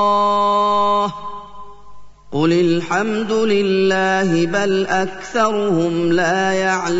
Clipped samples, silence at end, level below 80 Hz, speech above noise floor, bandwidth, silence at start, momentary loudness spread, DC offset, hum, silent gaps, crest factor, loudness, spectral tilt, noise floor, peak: under 0.1%; 0 s; -52 dBFS; 23 dB; 8 kHz; 0 s; 5 LU; 2%; 50 Hz at -50 dBFS; none; 12 dB; -17 LUFS; -5.5 dB/octave; -40 dBFS; -4 dBFS